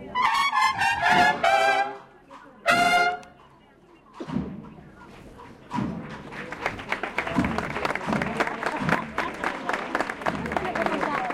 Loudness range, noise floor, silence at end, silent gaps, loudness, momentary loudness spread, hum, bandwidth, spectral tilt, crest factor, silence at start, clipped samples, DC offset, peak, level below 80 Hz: 12 LU; -54 dBFS; 0 s; none; -25 LUFS; 17 LU; none; 16 kHz; -4 dB/octave; 20 dB; 0 s; under 0.1%; under 0.1%; -6 dBFS; -50 dBFS